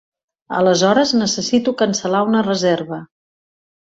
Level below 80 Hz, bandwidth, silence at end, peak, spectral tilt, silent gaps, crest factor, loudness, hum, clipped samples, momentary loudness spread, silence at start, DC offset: -58 dBFS; 8 kHz; 0.9 s; -2 dBFS; -4 dB/octave; none; 16 dB; -16 LUFS; none; under 0.1%; 9 LU; 0.5 s; under 0.1%